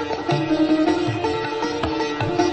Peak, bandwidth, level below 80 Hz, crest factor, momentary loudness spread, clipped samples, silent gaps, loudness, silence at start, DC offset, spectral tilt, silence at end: -6 dBFS; 8.6 kHz; -46 dBFS; 16 dB; 5 LU; under 0.1%; none; -21 LUFS; 0 s; under 0.1%; -6 dB/octave; 0 s